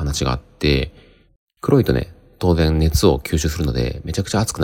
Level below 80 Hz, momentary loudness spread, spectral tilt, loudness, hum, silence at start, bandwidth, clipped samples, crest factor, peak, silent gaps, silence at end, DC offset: -30 dBFS; 8 LU; -5.5 dB/octave; -19 LUFS; none; 0 s; 17 kHz; under 0.1%; 18 dB; -2 dBFS; 1.36-1.47 s; 0 s; under 0.1%